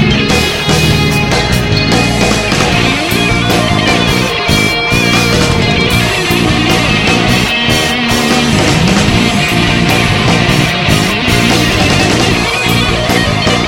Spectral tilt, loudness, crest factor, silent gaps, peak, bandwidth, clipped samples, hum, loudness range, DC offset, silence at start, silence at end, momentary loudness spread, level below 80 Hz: -4 dB/octave; -9 LUFS; 10 dB; none; 0 dBFS; 17 kHz; 0.4%; none; 1 LU; under 0.1%; 0 s; 0 s; 2 LU; -24 dBFS